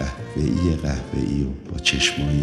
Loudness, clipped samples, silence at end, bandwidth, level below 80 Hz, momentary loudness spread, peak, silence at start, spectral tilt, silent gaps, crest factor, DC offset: -22 LUFS; under 0.1%; 0 s; 12.5 kHz; -32 dBFS; 7 LU; -6 dBFS; 0 s; -4.5 dB/octave; none; 16 dB; under 0.1%